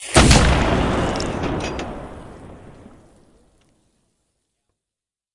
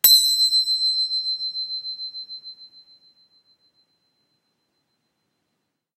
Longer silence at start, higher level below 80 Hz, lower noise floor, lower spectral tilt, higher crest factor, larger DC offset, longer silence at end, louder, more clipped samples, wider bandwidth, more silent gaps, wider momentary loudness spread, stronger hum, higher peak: about the same, 0 s vs 0.05 s; first, -28 dBFS vs -90 dBFS; first, -88 dBFS vs -77 dBFS; first, -4.5 dB/octave vs 4.5 dB/octave; about the same, 22 dB vs 24 dB; neither; second, 2.65 s vs 3.3 s; about the same, -18 LUFS vs -19 LUFS; neither; second, 11.5 kHz vs 16 kHz; neither; first, 26 LU vs 21 LU; neither; about the same, 0 dBFS vs 0 dBFS